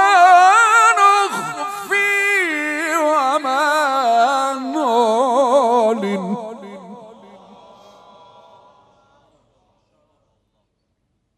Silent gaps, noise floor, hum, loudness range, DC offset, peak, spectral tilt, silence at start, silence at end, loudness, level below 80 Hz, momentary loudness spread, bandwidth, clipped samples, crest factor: none; -69 dBFS; none; 10 LU; under 0.1%; 0 dBFS; -3 dB/octave; 0 s; 4.25 s; -15 LUFS; -72 dBFS; 15 LU; 14.5 kHz; under 0.1%; 16 dB